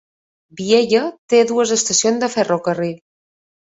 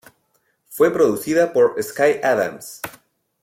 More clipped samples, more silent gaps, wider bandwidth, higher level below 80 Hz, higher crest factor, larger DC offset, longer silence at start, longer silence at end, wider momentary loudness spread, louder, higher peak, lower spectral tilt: neither; first, 1.18-1.28 s vs none; second, 8 kHz vs 16.5 kHz; about the same, -62 dBFS vs -62 dBFS; about the same, 16 dB vs 16 dB; neither; second, 0.55 s vs 0.7 s; first, 0.8 s vs 0.55 s; second, 10 LU vs 17 LU; about the same, -16 LUFS vs -18 LUFS; about the same, -2 dBFS vs -4 dBFS; second, -3 dB/octave vs -4.5 dB/octave